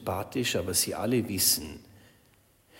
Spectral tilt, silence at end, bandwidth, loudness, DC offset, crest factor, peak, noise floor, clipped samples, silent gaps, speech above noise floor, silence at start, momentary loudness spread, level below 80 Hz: -3 dB/octave; 0 s; 16.5 kHz; -27 LUFS; under 0.1%; 20 dB; -10 dBFS; -63 dBFS; under 0.1%; none; 34 dB; 0 s; 7 LU; -58 dBFS